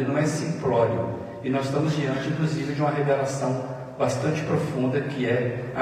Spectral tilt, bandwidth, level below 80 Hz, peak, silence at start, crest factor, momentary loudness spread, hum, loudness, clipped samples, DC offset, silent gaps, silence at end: -6.5 dB/octave; 13.5 kHz; -60 dBFS; -8 dBFS; 0 s; 16 dB; 5 LU; none; -25 LUFS; under 0.1%; under 0.1%; none; 0 s